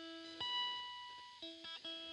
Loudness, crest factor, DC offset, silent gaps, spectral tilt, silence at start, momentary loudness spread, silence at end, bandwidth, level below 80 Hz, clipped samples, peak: -44 LUFS; 16 dB; under 0.1%; none; -1.5 dB/octave; 0 s; 12 LU; 0 s; 11.5 kHz; -84 dBFS; under 0.1%; -32 dBFS